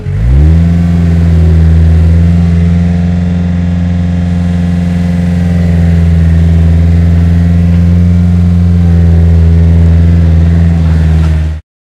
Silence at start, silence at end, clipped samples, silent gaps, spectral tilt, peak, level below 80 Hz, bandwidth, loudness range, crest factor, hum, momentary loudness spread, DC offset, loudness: 0 s; 0.35 s; 3%; none; -9 dB/octave; 0 dBFS; -16 dBFS; 5.4 kHz; 3 LU; 6 dB; none; 5 LU; under 0.1%; -8 LUFS